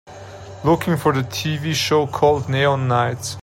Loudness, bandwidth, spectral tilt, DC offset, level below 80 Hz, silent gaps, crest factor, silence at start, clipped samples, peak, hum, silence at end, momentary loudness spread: -19 LUFS; 16.5 kHz; -5 dB/octave; under 0.1%; -48 dBFS; none; 18 dB; 0.05 s; under 0.1%; -2 dBFS; none; 0 s; 7 LU